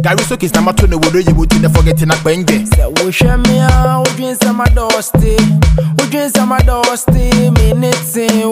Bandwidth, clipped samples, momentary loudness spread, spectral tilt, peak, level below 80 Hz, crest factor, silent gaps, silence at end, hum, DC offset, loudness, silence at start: 16 kHz; under 0.1%; 3 LU; -5.5 dB/octave; 0 dBFS; -16 dBFS; 10 dB; none; 0 s; none; under 0.1%; -11 LUFS; 0 s